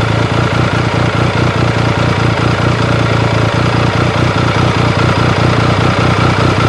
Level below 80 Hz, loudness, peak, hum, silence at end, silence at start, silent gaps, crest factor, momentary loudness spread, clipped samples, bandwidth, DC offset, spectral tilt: -28 dBFS; -12 LUFS; 0 dBFS; none; 0 s; 0 s; none; 10 dB; 2 LU; under 0.1%; 11.5 kHz; 0.2%; -6 dB/octave